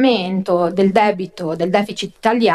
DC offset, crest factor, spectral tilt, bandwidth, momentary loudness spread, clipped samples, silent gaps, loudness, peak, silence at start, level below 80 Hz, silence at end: under 0.1%; 16 dB; -6 dB/octave; 12.5 kHz; 9 LU; under 0.1%; none; -17 LUFS; 0 dBFS; 0 s; -60 dBFS; 0 s